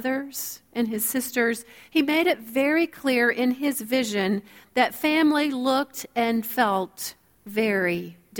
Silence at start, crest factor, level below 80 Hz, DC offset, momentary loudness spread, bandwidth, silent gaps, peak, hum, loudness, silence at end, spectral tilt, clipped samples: 0 s; 18 dB; -66 dBFS; under 0.1%; 10 LU; 19 kHz; none; -6 dBFS; none; -24 LUFS; 0 s; -3.5 dB/octave; under 0.1%